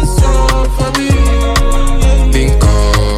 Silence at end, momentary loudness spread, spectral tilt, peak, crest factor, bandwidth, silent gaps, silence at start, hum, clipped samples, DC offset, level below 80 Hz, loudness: 0 s; 4 LU; -5 dB/octave; 0 dBFS; 8 dB; 14 kHz; none; 0 s; none; under 0.1%; under 0.1%; -10 dBFS; -12 LUFS